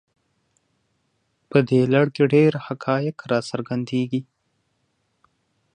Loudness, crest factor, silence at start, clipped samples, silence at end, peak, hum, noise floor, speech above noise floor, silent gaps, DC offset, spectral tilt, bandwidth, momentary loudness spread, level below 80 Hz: -21 LUFS; 20 dB; 1.5 s; under 0.1%; 1.55 s; -4 dBFS; none; -71 dBFS; 51 dB; none; under 0.1%; -7.5 dB/octave; 9.8 kHz; 10 LU; -66 dBFS